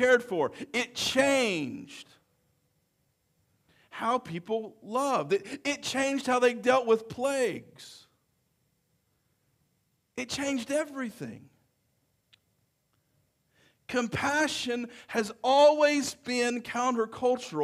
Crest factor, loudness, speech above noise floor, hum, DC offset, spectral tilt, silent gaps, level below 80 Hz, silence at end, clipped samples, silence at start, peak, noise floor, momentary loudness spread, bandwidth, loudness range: 18 dB; -28 LUFS; 46 dB; none; under 0.1%; -3.5 dB/octave; none; -68 dBFS; 0 s; under 0.1%; 0 s; -12 dBFS; -74 dBFS; 15 LU; 15.5 kHz; 11 LU